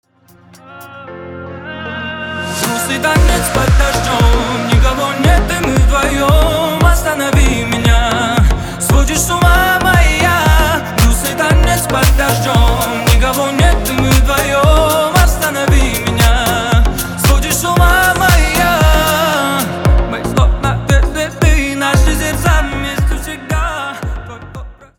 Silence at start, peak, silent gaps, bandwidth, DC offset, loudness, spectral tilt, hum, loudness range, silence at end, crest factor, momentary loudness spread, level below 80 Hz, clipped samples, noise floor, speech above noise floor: 0.7 s; 0 dBFS; none; 19 kHz; under 0.1%; -12 LUFS; -4.5 dB/octave; none; 3 LU; 0.25 s; 12 dB; 11 LU; -16 dBFS; under 0.1%; -45 dBFS; 34 dB